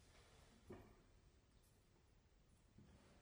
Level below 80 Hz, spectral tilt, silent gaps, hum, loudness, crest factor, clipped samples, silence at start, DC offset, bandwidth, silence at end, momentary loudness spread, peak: -74 dBFS; -5.5 dB/octave; none; none; -66 LUFS; 22 dB; under 0.1%; 0 s; under 0.1%; over 20 kHz; 0 s; 7 LU; -46 dBFS